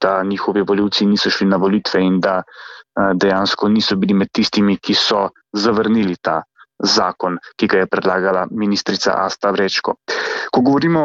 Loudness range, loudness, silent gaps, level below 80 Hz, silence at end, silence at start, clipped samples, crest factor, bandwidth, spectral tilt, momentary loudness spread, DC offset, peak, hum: 2 LU; -16 LUFS; none; -54 dBFS; 0 s; 0 s; under 0.1%; 14 dB; 7.6 kHz; -5 dB/octave; 6 LU; under 0.1%; -2 dBFS; none